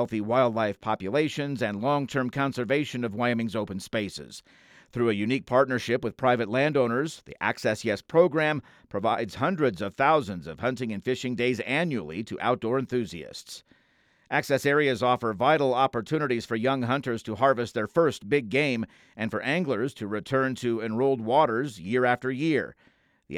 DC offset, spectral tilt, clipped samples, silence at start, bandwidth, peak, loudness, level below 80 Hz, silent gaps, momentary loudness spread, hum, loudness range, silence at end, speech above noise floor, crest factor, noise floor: under 0.1%; -6 dB/octave; under 0.1%; 0 s; 15.5 kHz; -8 dBFS; -26 LUFS; -64 dBFS; none; 9 LU; none; 4 LU; 0 s; 39 dB; 20 dB; -65 dBFS